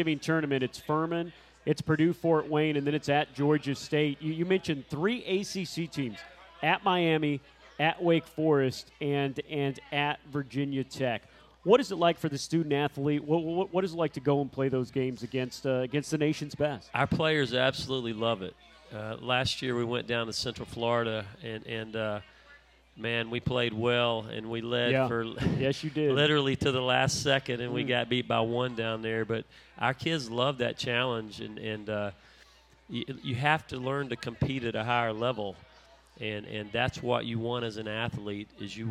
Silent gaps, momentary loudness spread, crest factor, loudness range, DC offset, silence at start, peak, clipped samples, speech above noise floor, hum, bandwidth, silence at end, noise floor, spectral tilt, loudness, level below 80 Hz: none; 11 LU; 22 dB; 5 LU; under 0.1%; 0 s; -8 dBFS; under 0.1%; 29 dB; none; 14.5 kHz; 0 s; -59 dBFS; -5.5 dB/octave; -30 LUFS; -60 dBFS